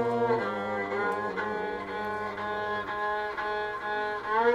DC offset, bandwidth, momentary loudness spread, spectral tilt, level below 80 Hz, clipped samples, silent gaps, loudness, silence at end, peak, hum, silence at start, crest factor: under 0.1%; 12.5 kHz; 6 LU; -6 dB/octave; -60 dBFS; under 0.1%; none; -31 LUFS; 0 s; -12 dBFS; none; 0 s; 18 dB